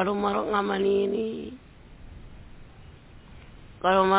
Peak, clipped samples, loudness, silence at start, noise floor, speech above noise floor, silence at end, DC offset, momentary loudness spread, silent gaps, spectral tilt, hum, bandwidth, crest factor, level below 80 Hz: -8 dBFS; under 0.1%; -26 LUFS; 0 s; -48 dBFS; 24 dB; 0 s; under 0.1%; 25 LU; none; -9.5 dB/octave; none; 4 kHz; 18 dB; -52 dBFS